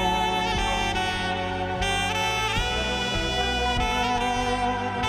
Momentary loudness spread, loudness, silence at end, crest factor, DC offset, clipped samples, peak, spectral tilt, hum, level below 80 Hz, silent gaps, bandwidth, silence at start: 3 LU; -25 LUFS; 0 s; 14 dB; under 0.1%; under 0.1%; -12 dBFS; -3.5 dB/octave; none; -36 dBFS; none; 16.5 kHz; 0 s